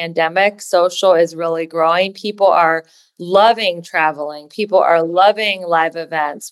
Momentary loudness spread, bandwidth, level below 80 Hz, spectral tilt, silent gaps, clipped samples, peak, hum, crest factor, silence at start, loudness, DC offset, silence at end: 8 LU; 12.5 kHz; -70 dBFS; -3.5 dB/octave; none; under 0.1%; -2 dBFS; none; 14 dB; 0 s; -15 LUFS; under 0.1%; 0.05 s